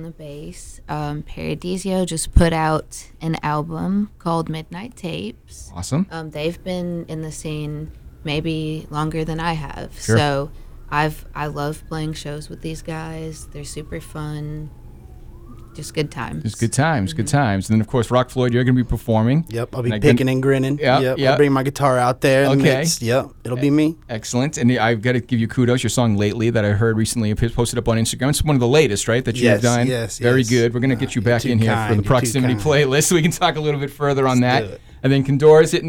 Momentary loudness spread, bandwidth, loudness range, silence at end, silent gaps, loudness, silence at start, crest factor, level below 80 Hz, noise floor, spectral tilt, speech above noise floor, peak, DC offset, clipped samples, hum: 15 LU; 17.5 kHz; 10 LU; 0 s; none; -19 LUFS; 0 s; 18 dB; -36 dBFS; -38 dBFS; -5.5 dB/octave; 20 dB; -2 dBFS; under 0.1%; under 0.1%; none